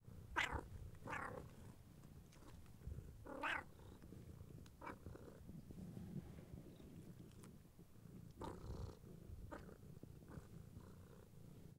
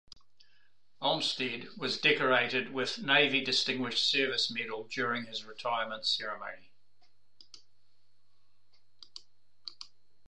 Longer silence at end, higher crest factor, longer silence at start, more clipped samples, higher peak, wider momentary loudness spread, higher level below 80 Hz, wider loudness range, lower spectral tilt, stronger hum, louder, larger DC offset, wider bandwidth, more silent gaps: second, 0 s vs 0.4 s; about the same, 28 dB vs 24 dB; second, 0 s vs 1 s; neither; second, -26 dBFS vs -10 dBFS; second, 17 LU vs 21 LU; first, -64 dBFS vs -78 dBFS; second, 6 LU vs 10 LU; first, -5 dB/octave vs -2.5 dB/octave; neither; second, -54 LUFS vs -30 LUFS; second, under 0.1% vs 0.3%; first, 16 kHz vs 10.5 kHz; neither